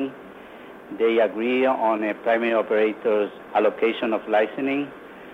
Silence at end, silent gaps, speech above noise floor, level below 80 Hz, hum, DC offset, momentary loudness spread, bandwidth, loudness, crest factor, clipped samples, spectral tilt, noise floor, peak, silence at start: 0 s; none; 20 dB; -66 dBFS; none; under 0.1%; 21 LU; 5.4 kHz; -22 LUFS; 16 dB; under 0.1%; -6.5 dB/octave; -42 dBFS; -8 dBFS; 0 s